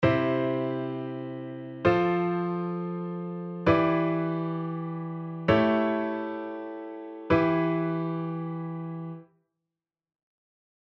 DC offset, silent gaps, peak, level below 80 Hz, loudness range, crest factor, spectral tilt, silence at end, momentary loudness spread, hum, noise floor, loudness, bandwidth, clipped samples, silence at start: under 0.1%; none; -10 dBFS; -56 dBFS; 3 LU; 20 dB; -9 dB/octave; 1.7 s; 14 LU; none; -89 dBFS; -28 LUFS; 6.2 kHz; under 0.1%; 0 s